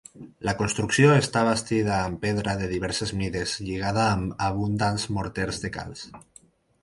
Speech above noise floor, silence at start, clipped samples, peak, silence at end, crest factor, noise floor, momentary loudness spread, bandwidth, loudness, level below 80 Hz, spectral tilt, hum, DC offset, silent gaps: 32 dB; 0.15 s; under 0.1%; -6 dBFS; 0.65 s; 20 dB; -56 dBFS; 13 LU; 11.5 kHz; -25 LUFS; -46 dBFS; -5 dB/octave; none; under 0.1%; none